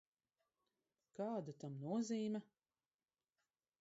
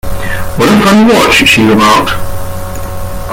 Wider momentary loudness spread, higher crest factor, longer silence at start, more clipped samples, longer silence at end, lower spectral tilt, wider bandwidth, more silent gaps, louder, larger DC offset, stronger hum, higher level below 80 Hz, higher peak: second, 9 LU vs 16 LU; first, 16 dB vs 8 dB; first, 1.2 s vs 0.05 s; second, under 0.1% vs 0.3%; first, 1.35 s vs 0 s; first, -7 dB/octave vs -4.5 dB/octave; second, 7.6 kHz vs 17 kHz; neither; second, -45 LUFS vs -7 LUFS; neither; neither; second, under -90 dBFS vs -24 dBFS; second, -32 dBFS vs 0 dBFS